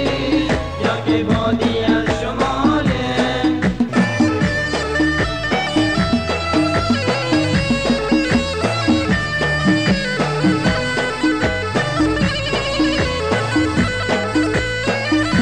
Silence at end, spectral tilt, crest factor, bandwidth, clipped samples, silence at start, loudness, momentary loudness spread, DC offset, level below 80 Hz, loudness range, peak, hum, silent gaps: 0 s; -5.5 dB/octave; 14 dB; 10 kHz; under 0.1%; 0 s; -17 LUFS; 3 LU; 0.7%; -34 dBFS; 1 LU; -2 dBFS; none; none